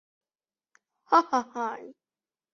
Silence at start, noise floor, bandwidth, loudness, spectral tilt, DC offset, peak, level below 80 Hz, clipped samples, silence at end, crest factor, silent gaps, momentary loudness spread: 1.1 s; under -90 dBFS; 7.4 kHz; -26 LUFS; -3.5 dB/octave; under 0.1%; -8 dBFS; -80 dBFS; under 0.1%; 0.6 s; 24 dB; none; 12 LU